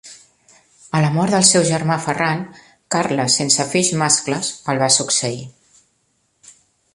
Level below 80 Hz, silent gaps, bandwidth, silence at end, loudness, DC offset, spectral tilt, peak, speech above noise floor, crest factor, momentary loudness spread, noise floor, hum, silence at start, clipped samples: -58 dBFS; none; 11.5 kHz; 1.45 s; -17 LUFS; under 0.1%; -3 dB/octave; 0 dBFS; 48 dB; 20 dB; 11 LU; -65 dBFS; none; 0.05 s; under 0.1%